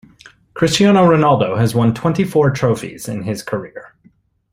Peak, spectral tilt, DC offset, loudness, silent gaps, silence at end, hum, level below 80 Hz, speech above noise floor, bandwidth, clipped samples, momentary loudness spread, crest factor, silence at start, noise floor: -2 dBFS; -6 dB/octave; under 0.1%; -15 LUFS; none; 0.7 s; none; -48 dBFS; 39 dB; 16 kHz; under 0.1%; 14 LU; 14 dB; 0.55 s; -54 dBFS